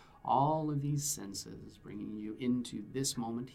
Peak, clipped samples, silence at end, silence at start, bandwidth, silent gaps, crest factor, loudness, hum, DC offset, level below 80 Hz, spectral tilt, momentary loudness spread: -18 dBFS; under 0.1%; 0 s; 0 s; 16 kHz; none; 18 dB; -35 LUFS; none; under 0.1%; -64 dBFS; -5 dB/octave; 14 LU